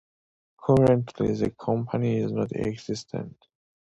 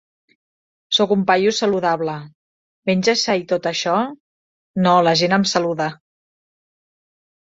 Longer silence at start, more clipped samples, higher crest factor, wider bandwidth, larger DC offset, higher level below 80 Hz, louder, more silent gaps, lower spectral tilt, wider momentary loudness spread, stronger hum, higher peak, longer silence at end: second, 0.6 s vs 0.9 s; neither; about the same, 18 dB vs 18 dB; first, 11 kHz vs 7.8 kHz; neither; first, -52 dBFS vs -62 dBFS; second, -26 LUFS vs -18 LUFS; second, none vs 2.35-2.82 s, 4.20-4.74 s; first, -8 dB/octave vs -4.5 dB/octave; first, 14 LU vs 11 LU; neither; second, -8 dBFS vs -2 dBFS; second, 0.7 s vs 1.6 s